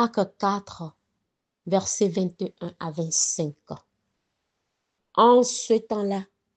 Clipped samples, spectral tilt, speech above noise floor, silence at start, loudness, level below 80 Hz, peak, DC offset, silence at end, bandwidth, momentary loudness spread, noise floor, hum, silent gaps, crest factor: under 0.1%; -4 dB/octave; 56 dB; 0 s; -24 LUFS; -70 dBFS; -6 dBFS; under 0.1%; 0.3 s; 9 kHz; 22 LU; -80 dBFS; none; none; 20 dB